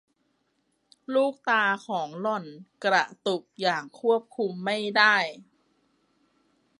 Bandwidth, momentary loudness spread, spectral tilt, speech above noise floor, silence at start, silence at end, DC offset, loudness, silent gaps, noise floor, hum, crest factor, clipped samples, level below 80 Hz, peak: 11.5 kHz; 11 LU; -4 dB/octave; 47 dB; 1.1 s; 1.4 s; under 0.1%; -26 LUFS; none; -73 dBFS; none; 22 dB; under 0.1%; -82 dBFS; -6 dBFS